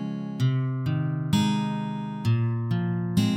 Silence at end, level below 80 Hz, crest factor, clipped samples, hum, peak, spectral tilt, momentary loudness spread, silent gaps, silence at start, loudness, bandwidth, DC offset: 0 s; -58 dBFS; 14 dB; under 0.1%; none; -10 dBFS; -7 dB/octave; 5 LU; none; 0 s; -26 LUFS; 14.5 kHz; under 0.1%